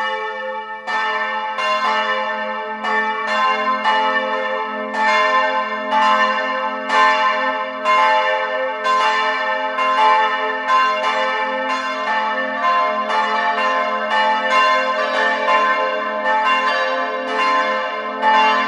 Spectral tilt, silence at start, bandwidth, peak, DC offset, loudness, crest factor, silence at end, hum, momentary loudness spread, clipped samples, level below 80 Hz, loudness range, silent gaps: -2 dB/octave; 0 s; 11 kHz; -2 dBFS; under 0.1%; -17 LUFS; 16 dB; 0 s; none; 7 LU; under 0.1%; -72 dBFS; 2 LU; none